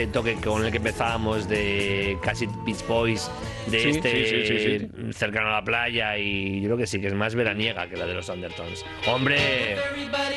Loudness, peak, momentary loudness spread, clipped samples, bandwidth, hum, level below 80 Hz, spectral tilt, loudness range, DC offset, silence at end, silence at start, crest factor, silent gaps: -25 LUFS; -8 dBFS; 8 LU; under 0.1%; 12.5 kHz; none; -46 dBFS; -4.5 dB/octave; 2 LU; under 0.1%; 0 s; 0 s; 16 dB; none